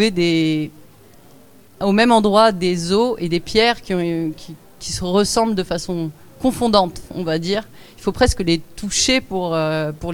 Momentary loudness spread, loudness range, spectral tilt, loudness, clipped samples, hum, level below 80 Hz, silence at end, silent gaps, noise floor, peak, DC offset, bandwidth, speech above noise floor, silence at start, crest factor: 12 LU; 3 LU; -4.5 dB/octave; -18 LUFS; under 0.1%; none; -38 dBFS; 0 s; none; -48 dBFS; 0 dBFS; 0.3%; 19.5 kHz; 30 dB; 0 s; 18 dB